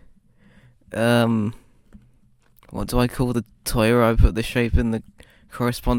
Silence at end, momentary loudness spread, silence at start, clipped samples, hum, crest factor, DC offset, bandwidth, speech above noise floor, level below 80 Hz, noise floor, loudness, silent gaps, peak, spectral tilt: 0 s; 13 LU; 0.9 s; under 0.1%; none; 20 dB; under 0.1%; 17 kHz; 38 dB; -30 dBFS; -57 dBFS; -22 LUFS; none; -2 dBFS; -6 dB/octave